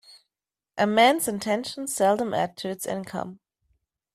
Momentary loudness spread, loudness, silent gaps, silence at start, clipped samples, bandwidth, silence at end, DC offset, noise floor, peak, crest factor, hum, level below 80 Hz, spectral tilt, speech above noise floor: 15 LU; -25 LUFS; none; 0.1 s; under 0.1%; 15.5 kHz; 0.8 s; under 0.1%; under -90 dBFS; -6 dBFS; 20 dB; none; -66 dBFS; -3.5 dB/octave; over 66 dB